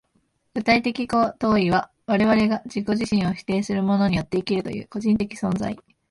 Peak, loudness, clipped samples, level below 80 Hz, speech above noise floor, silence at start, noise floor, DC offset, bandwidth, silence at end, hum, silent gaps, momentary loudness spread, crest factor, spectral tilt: -6 dBFS; -22 LUFS; under 0.1%; -50 dBFS; 46 dB; 0.55 s; -68 dBFS; under 0.1%; 11.5 kHz; 0.3 s; none; none; 8 LU; 18 dB; -6.5 dB/octave